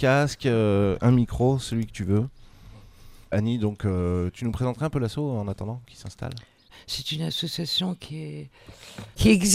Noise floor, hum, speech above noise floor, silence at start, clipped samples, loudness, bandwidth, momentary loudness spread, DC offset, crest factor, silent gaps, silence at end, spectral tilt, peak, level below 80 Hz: -47 dBFS; none; 23 dB; 0 s; under 0.1%; -25 LUFS; 16 kHz; 17 LU; under 0.1%; 20 dB; none; 0 s; -5.5 dB/octave; -4 dBFS; -44 dBFS